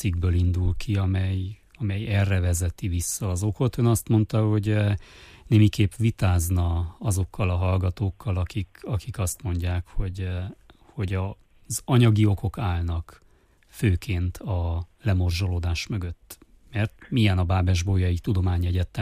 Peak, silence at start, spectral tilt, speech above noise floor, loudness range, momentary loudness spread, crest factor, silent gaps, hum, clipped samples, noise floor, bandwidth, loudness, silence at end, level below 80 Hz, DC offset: -8 dBFS; 0 s; -6 dB/octave; 34 dB; 5 LU; 10 LU; 16 dB; none; none; under 0.1%; -58 dBFS; 15.5 kHz; -25 LUFS; 0 s; -38 dBFS; under 0.1%